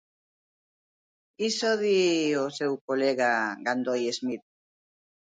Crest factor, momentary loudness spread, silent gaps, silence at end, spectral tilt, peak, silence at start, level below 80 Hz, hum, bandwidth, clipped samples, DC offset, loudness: 18 dB; 9 LU; 2.81-2.88 s; 0.8 s; -3.5 dB/octave; -12 dBFS; 1.4 s; -78 dBFS; none; 9.6 kHz; under 0.1%; under 0.1%; -27 LUFS